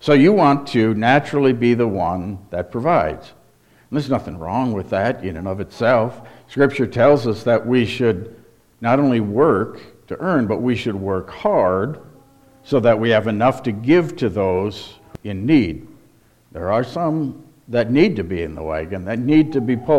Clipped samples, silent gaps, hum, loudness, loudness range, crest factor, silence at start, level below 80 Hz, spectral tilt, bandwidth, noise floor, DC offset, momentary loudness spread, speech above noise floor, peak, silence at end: under 0.1%; none; none; -18 LUFS; 4 LU; 16 dB; 0 s; -48 dBFS; -7.5 dB/octave; 12.5 kHz; -53 dBFS; under 0.1%; 12 LU; 36 dB; -2 dBFS; 0 s